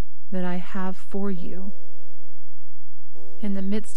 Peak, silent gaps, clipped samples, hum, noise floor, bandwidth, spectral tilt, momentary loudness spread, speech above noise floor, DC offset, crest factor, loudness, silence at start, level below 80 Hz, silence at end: -8 dBFS; none; under 0.1%; none; -56 dBFS; 11.5 kHz; -7.5 dB/octave; 10 LU; 26 dB; 30%; 16 dB; -32 LUFS; 0 s; -64 dBFS; 0 s